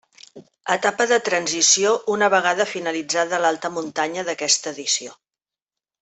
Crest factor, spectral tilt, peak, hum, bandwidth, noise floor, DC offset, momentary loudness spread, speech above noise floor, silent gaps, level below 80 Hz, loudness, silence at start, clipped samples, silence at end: 18 dB; -1 dB/octave; -4 dBFS; none; 8.6 kHz; under -90 dBFS; under 0.1%; 9 LU; over 69 dB; none; -72 dBFS; -20 LUFS; 0.35 s; under 0.1%; 0.9 s